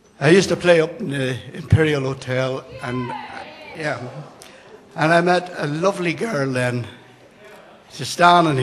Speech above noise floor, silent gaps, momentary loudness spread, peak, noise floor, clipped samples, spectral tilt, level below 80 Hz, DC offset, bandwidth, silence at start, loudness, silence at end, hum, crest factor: 27 dB; none; 20 LU; 0 dBFS; -46 dBFS; under 0.1%; -5.5 dB/octave; -48 dBFS; under 0.1%; 13 kHz; 0.2 s; -19 LUFS; 0 s; none; 20 dB